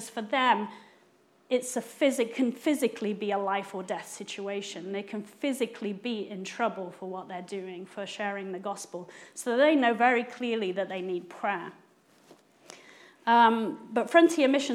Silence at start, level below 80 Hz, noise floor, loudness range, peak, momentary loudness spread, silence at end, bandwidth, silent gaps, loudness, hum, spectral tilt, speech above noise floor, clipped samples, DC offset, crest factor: 0 s; under -90 dBFS; -63 dBFS; 7 LU; -6 dBFS; 16 LU; 0 s; 15.5 kHz; none; -29 LUFS; none; -4 dB/octave; 35 dB; under 0.1%; under 0.1%; 24 dB